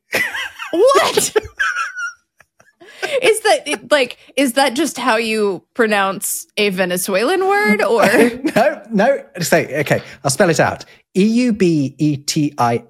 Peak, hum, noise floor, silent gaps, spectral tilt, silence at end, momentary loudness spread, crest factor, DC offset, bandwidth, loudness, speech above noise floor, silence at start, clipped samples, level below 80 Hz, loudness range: 0 dBFS; none; -54 dBFS; none; -4 dB/octave; 0.1 s; 8 LU; 16 dB; under 0.1%; 17 kHz; -16 LUFS; 38 dB; 0.1 s; under 0.1%; -56 dBFS; 3 LU